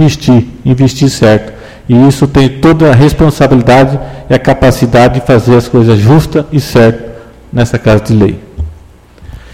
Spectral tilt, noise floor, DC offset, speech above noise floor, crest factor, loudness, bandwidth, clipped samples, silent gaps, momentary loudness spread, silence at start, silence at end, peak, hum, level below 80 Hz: -7 dB/octave; -35 dBFS; 0.9%; 29 dB; 8 dB; -7 LUFS; 15.5 kHz; 3%; none; 12 LU; 0 s; 0.15 s; 0 dBFS; none; -26 dBFS